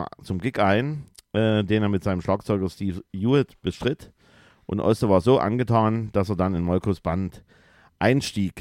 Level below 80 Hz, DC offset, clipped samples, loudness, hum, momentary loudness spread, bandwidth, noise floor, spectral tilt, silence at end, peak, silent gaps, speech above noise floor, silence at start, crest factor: -48 dBFS; under 0.1%; under 0.1%; -24 LUFS; none; 10 LU; 15 kHz; -56 dBFS; -7 dB/octave; 0 s; -4 dBFS; none; 33 dB; 0 s; 18 dB